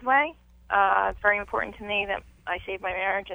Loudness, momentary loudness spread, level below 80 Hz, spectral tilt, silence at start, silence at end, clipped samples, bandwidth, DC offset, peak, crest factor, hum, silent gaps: -26 LUFS; 10 LU; -50 dBFS; -5.5 dB/octave; 0 s; 0 s; under 0.1%; over 20 kHz; under 0.1%; -8 dBFS; 18 dB; none; none